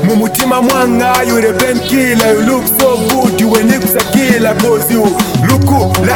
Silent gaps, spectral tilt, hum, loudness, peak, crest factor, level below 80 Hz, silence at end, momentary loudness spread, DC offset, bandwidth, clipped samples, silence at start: none; -5 dB/octave; none; -10 LUFS; 0 dBFS; 10 dB; -38 dBFS; 0 s; 2 LU; under 0.1%; 17.5 kHz; under 0.1%; 0 s